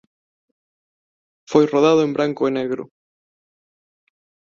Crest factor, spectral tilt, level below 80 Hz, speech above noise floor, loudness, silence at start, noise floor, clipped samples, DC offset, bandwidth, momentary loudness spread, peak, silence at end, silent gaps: 20 dB; -6 dB/octave; -66 dBFS; over 73 dB; -18 LUFS; 1.5 s; under -90 dBFS; under 0.1%; under 0.1%; 7.4 kHz; 11 LU; -2 dBFS; 1.65 s; none